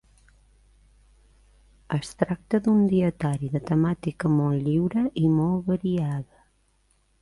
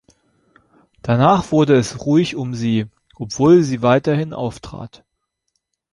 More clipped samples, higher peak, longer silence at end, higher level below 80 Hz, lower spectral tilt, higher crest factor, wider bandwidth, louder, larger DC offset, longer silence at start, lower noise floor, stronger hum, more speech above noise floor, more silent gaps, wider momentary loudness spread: neither; second, -6 dBFS vs -2 dBFS; about the same, 1 s vs 1.05 s; about the same, -54 dBFS vs -50 dBFS; first, -8.5 dB/octave vs -6.5 dB/octave; about the same, 18 dB vs 16 dB; about the same, 11.5 kHz vs 11.5 kHz; second, -25 LUFS vs -16 LUFS; neither; first, 1.9 s vs 1.05 s; second, -66 dBFS vs -73 dBFS; neither; second, 42 dB vs 56 dB; neither; second, 9 LU vs 20 LU